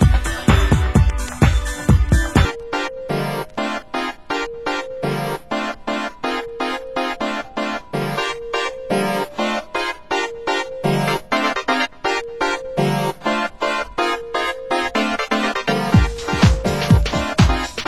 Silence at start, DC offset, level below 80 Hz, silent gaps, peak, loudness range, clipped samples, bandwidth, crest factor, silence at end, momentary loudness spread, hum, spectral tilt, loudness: 0 s; 0.7%; -26 dBFS; none; 0 dBFS; 6 LU; under 0.1%; 16 kHz; 20 dB; 0 s; 8 LU; none; -5.5 dB/octave; -20 LUFS